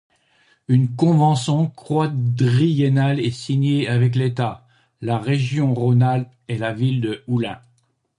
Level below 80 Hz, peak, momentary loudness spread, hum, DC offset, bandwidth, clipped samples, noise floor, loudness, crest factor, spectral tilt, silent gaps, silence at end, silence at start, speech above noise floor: -58 dBFS; -4 dBFS; 8 LU; none; under 0.1%; 11 kHz; under 0.1%; -63 dBFS; -20 LUFS; 16 dB; -7.5 dB/octave; none; 0.6 s; 0.7 s; 45 dB